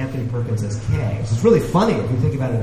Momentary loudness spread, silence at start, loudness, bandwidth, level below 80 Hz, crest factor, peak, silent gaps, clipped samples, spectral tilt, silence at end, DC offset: 8 LU; 0 s; -19 LUFS; 13.5 kHz; -38 dBFS; 16 dB; -2 dBFS; none; under 0.1%; -7.5 dB/octave; 0 s; under 0.1%